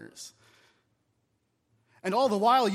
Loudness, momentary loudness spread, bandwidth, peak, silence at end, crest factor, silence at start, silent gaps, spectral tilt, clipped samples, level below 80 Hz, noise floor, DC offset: -26 LUFS; 23 LU; 15.5 kHz; -12 dBFS; 0 s; 18 dB; 0 s; none; -4.5 dB/octave; under 0.1%; -84 dBFS; -76 dBFS; under 0.1%